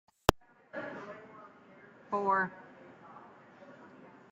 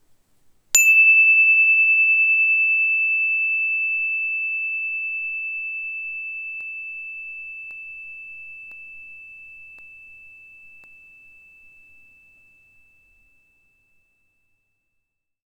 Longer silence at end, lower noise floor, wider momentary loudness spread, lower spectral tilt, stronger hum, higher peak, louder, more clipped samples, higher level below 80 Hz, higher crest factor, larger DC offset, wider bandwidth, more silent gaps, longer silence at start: second, 0.2 s vs 5.15 s; second, -57 dBFS vs -76 dBFS; about the same, 25 LU vs 25 LU; first, -4.5 dB/octave vs 4 dB/octave; neither; second, -4 dBFS vs 0 dBFS; second, -34 LUFS vs -16 LUFS; neither; first, -52 dBFS vs -68 dBFS; first, 34 dB vs 22 dB; neither; second, 15.5 kHz vs over 20 kHz; neither; second, 0.3 s vs 0.75 s